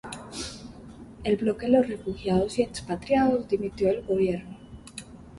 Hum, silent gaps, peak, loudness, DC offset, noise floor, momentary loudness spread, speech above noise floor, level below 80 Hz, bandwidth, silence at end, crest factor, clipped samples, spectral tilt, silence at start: none; none; -8 dBFS; -26 LUFS; under 0.1%; -45 dBFS; 20 LU; 20 dB; -50 dBFS; 11.5 kHz; 0 s; 18 dB; under 0.1%; -6 dB/octave; 0.05 s